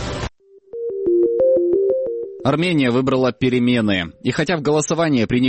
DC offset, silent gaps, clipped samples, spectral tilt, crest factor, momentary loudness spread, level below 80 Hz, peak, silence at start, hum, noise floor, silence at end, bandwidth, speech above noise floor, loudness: under 0.1%; none; under 0.1%; -5.5 dB/octave; 14 dB; 11 LU; -44 dBFS; -4 dBFS; 0 s; none; -39 dBFS; 0 s; 8.8 kHz; 21 dB; -18 LUFS